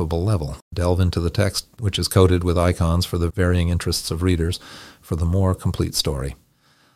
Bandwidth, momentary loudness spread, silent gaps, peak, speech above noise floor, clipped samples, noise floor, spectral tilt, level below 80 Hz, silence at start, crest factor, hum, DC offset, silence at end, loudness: 15.5 kHz; 11 LU; 0.62-0.71 s; -2 dBFS; 38 dB; under 0.1%; -58 dBFS; -5.5 dB/octave; -36 dBFS; 0 s; 20 dB; none; under 0.1%; 0.6 s; -21 LUFS